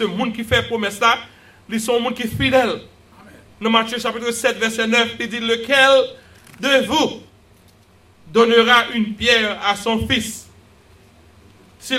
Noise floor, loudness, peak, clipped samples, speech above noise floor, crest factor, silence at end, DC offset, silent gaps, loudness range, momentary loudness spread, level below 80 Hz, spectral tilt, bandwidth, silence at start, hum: -51 dBFS; -17 LUFS; 0 dBFS; under 0.1%; 33 dB; 20 dB; 0 s; under 0.1%; none; 3 LU; 11 LU; -46 dBFS; -3.5 dB/octave; 16 kHz; 0 s; none